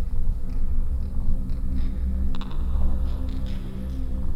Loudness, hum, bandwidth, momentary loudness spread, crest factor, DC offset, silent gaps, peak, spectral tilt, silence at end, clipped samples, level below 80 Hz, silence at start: -30 LUFS; none; 4.2 kHz; 4 LU; 12 dB; under 0.1%; none; -10 dBFS; -8.5 dB/octave; 0 s; under 0.1%; -24 dBFS; 0 s